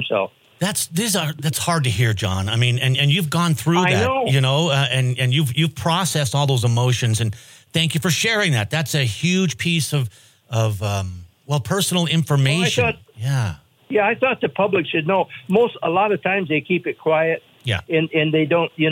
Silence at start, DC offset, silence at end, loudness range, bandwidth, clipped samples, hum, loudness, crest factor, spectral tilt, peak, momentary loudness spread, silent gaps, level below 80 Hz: 0 s; under 0.1%; 0 s; 3 LU; 16.5 kHz; under 0.1%; none; -19 LUFS; 16 dB; -4.5 dB/octave; -4 dBFS; 7 LU; none; -52 dBFS